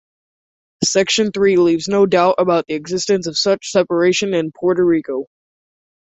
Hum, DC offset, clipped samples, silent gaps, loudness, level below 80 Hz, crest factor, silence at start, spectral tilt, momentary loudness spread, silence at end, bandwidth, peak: none; under 0.1%; under 0.1%; none; -16 LUFS; -56 dBFS; 16 dB; 0.8 s; -4 dB/octave; 7 LU; 0.85 s; 8.4 kHz; -2 dBFS